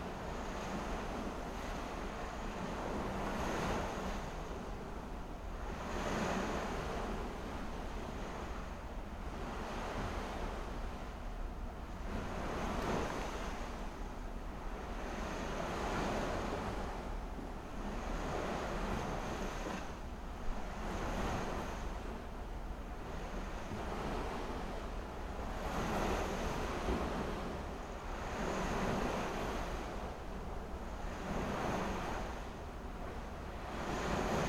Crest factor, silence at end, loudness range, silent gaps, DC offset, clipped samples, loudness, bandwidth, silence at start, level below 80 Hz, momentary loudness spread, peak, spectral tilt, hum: 18 dB; 0 s; 4 LU; none; under 0.1%; under 0.1%; -41 LUFS; 16.5 kHz; 0 s; -46 dBFS; 9 LU; -22 dBFS; -5.5 dB/octave; none